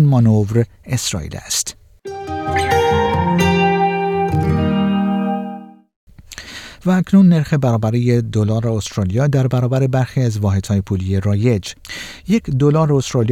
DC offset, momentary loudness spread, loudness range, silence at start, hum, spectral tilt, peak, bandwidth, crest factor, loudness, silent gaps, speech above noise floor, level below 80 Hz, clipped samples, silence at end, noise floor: under 0.1%; 15 LU; 3 LU; 0 s; none; -6 dB/octave; -2 dBFS; 15.5 kHz; 14 dB; -16 LUFS; 5.96-6.07 s; 19 dB; -42 dBFS; under 0.1%; 0 s; -35 dBFS